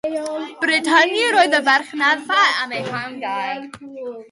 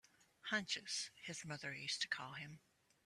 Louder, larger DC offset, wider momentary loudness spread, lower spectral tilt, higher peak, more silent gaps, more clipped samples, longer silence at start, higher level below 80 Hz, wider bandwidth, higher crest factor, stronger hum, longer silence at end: first, -17 LUFS vs -44 LUFS; neither; first, 16 LU vs 12 LU; about the same, -2.5 dB/octave vs -1.5 dB/octave; first, -2 dBFS vs -26 dBFS; neither; neither; second, 0.05 s vs 0.2 s; first, -68 dBFS vs -84 dBFS; second, 11.5 kHz vs 14 kHz; second, 16 dB vs 22 dB; neither; second, 0.05 s vs 0.5 s